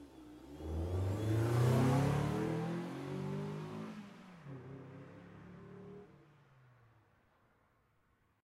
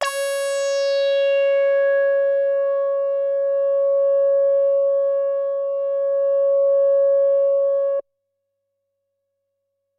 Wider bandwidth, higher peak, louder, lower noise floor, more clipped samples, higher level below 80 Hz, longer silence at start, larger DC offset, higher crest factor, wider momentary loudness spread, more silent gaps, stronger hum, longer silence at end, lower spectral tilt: first, 15 kHz vs 13 kHz; second, -22 dBFS vs -8 dBFS; second, -37 LUFS vs -19 LUFS; about the same, -75 dBFS vs -76 dBFS; neither; first, -56 dBFS vs -86 dBFS; about the same, 0 s vs 0 s; neither; first, 18 dB vs 12 dB; first, 23 LU vs 6 LU; neither; second, none vs 50 Hz at -95 dBFS; first, 2.4 s vs 1.95 s; first, -7.5 dB/octave vs 2 dB/octave